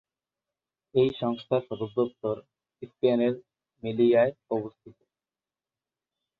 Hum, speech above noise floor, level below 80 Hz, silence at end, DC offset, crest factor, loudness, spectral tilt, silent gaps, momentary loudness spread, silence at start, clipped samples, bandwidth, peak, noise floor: none; over 64 dB; -68 dBFS; 1.5 s; under 0.1%; 18 dB; -27 LUFS; -9.5 dB/octave; none; 16 LU; 0.95 s; under 0.1%; 4.8 kHz; -10 dBFS; under -90 dBFS